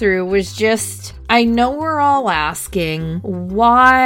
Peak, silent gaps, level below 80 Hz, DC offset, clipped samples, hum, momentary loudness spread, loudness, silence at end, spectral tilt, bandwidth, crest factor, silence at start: 0 dBFS; none; -38 dBFS; under 0.1%; under 0.1%; none; 10 LU; -16 LUFS; 0 s; -4.5 dB/octave; 17 kHz; 16 dB; 0 s